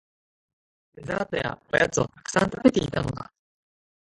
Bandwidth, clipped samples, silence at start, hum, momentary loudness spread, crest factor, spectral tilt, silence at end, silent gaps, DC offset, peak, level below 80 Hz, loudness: 11.5 kHz; under 0.1%; 0.95 s; none; 14 LU; 22 dB; -5 dB/octave; 0.8 s; none; under 0.1%; -4 dBFS; -52 dBFS; -25 LUFS